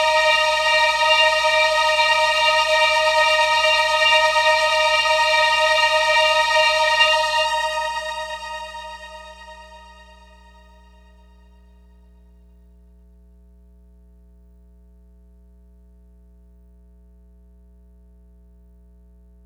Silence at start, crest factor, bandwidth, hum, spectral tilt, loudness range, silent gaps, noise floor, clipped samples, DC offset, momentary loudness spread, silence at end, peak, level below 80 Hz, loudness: 0 s; 18 dB; 16 kHz; 60 Hz at -50 dBFS; 0.5 dB/octave; 15 LU; none; -49 dBFS; under 0.1%; under 0.1%; 15 LU; 9.65 s; -2 dBFS; -50 dBFS; -16 LUFS